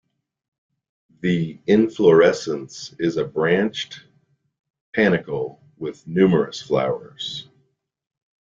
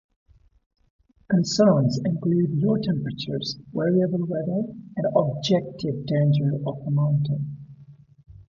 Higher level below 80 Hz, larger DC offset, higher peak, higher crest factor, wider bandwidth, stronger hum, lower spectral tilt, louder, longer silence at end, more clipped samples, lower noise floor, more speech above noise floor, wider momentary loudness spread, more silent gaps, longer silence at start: about the same, -60 dBFS vs -58 dBFS; neither; first, -2 dBFS vs -6 dBFS; about the same, 20 dB vs 18 dB; about the same, 7.6 kHz vs 7.6 kHz; neither; about the same, -6 dB/octave vs -7 dB/octave; first, -20 LUFS vs -24 LUFS; first, 1.05 s vs 0.05 s; neither; first, -67 dBFS vs -49 dBFS; first, 48 dB vs 27 dB; first, 17 LU vs 10 LU; first, 4.59-4.64 s, 4.70-4.74 s, 4.81-4.93 s vs none; about the same, 1.25 s vs 1.3 s